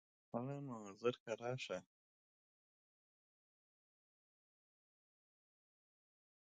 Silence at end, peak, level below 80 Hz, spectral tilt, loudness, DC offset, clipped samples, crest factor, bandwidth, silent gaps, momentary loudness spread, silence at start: 4.65 s; -26 dBFS; -88 dBFS; -5.5 dB/octave; -46 LUFS; under 0.1%; under 0.1%; 26 dB; 9 kHz; 1.20-1.26 s; 7 LU; 0.35 s